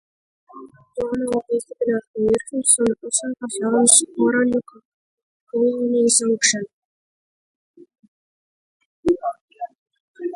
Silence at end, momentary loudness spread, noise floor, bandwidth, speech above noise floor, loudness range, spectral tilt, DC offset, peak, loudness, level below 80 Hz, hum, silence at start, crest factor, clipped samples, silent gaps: 0 s; 17 LU; under -90 dBFS; 11.5 kHz; over 70 dB; 12 LU; -2 dB/octave; under 0.1%; 0 dBFS; -19 LUFS; -58 dBFS; none; 0.55 s; 22 dB; under 0.1%; 2.07-2.14 s, 4.85-5.47 s, 6.73-7.74 s, 8.08-9.03 s, 9.41-9.48 s, 9.78-9.86 s, 10.00-10.14 s